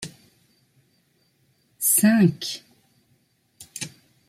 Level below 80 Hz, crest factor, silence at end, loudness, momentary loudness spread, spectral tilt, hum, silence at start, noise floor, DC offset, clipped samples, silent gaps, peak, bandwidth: -66 dBFS; 20 dB; 0.4 s; -21 LUFS; 21 LU; -4 dB/octave; none; 0 s; -66 dBFS; under 0.1%; under 0.1%; none; -8 dBFS; 16 kHz